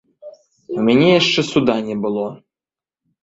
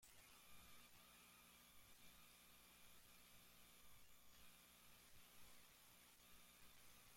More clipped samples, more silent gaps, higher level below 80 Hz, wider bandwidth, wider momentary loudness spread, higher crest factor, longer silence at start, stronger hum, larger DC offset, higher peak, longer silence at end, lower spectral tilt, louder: neither; neither; first, -56 dBFS vs -80 dBFS; second, 8 kHz vs 16.5 kHz; first, 13 LU vs 1 LU; about the same, 18 dB vs 14 dB; first, 0.25 s vs 0 s; second, none vs 60 Hz at -80 dBFS; neither; first, -2 dBFS vs -52 dBFS; first, 0.85 s vs 0 s; first, -5.5 dB/octave vs -1.5 dB/octave; first, -16 LUFS vs -67 LUFS